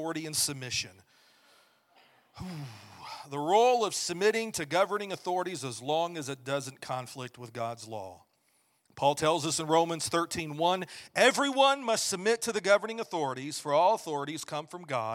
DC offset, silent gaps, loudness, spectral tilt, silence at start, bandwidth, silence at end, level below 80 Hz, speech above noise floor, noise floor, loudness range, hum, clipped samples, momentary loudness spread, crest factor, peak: under 0.1%; none; -29 LUFS; -3 dB/octave; 0 s; 17 kHz; 0 s; -70 dBFS; 41 dB; -71 dBFS; 9 LU; none; under 0.1%; 17 LU; 24 dB; -8 dBFS